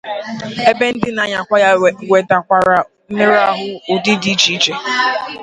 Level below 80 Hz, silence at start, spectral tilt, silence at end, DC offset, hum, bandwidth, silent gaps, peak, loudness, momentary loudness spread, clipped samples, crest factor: -54 dBFS; 0.05 s; -3.5 dB/octave; 0 s; under 0.1%; none; 11 kHz; none; 0 dBFS; -14 LUFS; 8 LU; under 0.1%; 14 dB